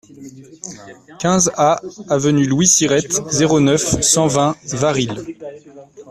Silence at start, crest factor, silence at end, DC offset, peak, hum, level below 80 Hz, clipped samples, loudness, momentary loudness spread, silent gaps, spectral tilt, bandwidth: 0.2 s; 16 dB; 0 s; under 0.1%; 0 dBFS; none; -46 dBFS; under 0.1%; -15 LUFS; 20 LU; none; -4 dB/octave; 14.5 kHz